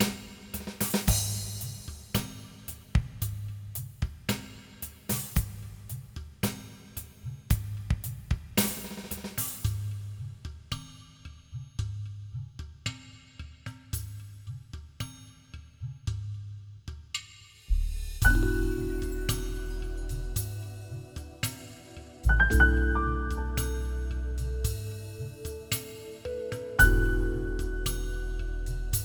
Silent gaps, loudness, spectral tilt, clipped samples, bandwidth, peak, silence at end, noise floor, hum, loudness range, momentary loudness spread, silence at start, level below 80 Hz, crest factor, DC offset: none; -32 LUFS; -4.5 dB/octave; under 0.1%; over 20 kHz; -6 dBFS; 0 s; -51 dBFS; none; 12 LU; 18 LU; 0 s; -34 dBFS; 24 dB; under 0.1%